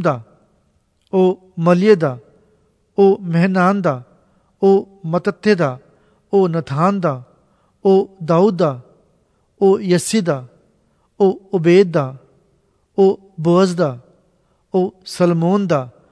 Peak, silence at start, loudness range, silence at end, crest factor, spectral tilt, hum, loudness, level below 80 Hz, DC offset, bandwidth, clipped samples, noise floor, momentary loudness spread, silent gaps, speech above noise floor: 0 dBFS; 0 s; 2 LU; 0.25 s; 18 dB; -7 dB/octave; none; -16 LUFS; -62 dBFS; under 0.1%; 11 kHz; under 0.1%; -61 dBFS; 9 LU; none; 46 dB